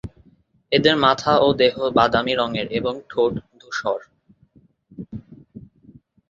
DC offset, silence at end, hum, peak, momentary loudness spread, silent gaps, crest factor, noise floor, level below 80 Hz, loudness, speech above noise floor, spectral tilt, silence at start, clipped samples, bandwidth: under 0.1%; 0.65 s; none; -2 dBFS; 20 LU; none; 20 dB; -57 dBFS; -52 dBFS; -20 LUFS; 38 dB; -5.5 dB/octave; 0.05 s; under 0.1%; 7.6 kHz